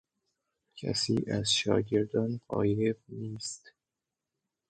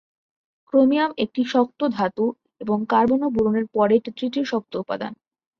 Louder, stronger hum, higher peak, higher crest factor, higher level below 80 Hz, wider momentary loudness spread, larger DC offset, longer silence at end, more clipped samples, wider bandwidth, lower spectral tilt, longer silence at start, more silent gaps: second, -31 LUFS vs -22 LUFS; neither; second, -12 dBFS vs -6 dBFS; about the same, 20 dB vs 16 dB; about the same, -60 dBFS vs -58 dBFS; first, 13 LU vs 10 LU; neither; first, 1 s vs 0.45 s; neither; first, 9.4 kHz vs 7 kHz; second, -4.5 dB/octave vs -7 dB/octave; about the same, 0.75 s vs 0.75 s; neither